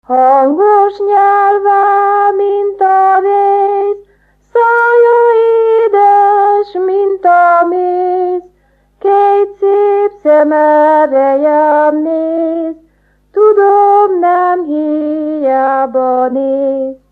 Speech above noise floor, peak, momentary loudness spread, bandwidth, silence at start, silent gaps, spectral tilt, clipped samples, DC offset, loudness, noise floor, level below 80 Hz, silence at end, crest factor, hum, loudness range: 43 dB; 0 dBFS; 7 LU; 4.7 kHz; 0.1 s; none; -6 dB/octave; under 0.1%; under 0.1%; -10 LUFS; -52 dBFS; -56 dBFS; 0.15 s; 10 dB; 50 Hz at -55 dBFS; 2 LU